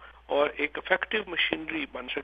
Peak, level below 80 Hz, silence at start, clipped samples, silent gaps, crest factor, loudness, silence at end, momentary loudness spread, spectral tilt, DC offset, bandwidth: -8 dBFS; -58 dBFS; 0 s; under 0.1%; none; 22 dB; -28 LUFS; 0 s; 7 LU; -6 dB/octave; under 0.1%; 5 kHz